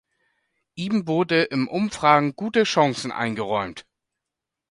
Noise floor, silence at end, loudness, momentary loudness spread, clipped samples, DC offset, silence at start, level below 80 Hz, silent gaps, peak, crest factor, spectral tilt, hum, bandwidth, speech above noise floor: -85 dBFS; 0.9 s; -22 LUFS; 13 LU; under 0.1%; under 0.1%; 0.75 s; -62 dBFS; none; -2 dBFS; 20 dB; -5 dB/octave; none; 11.5 kHz; 64 dB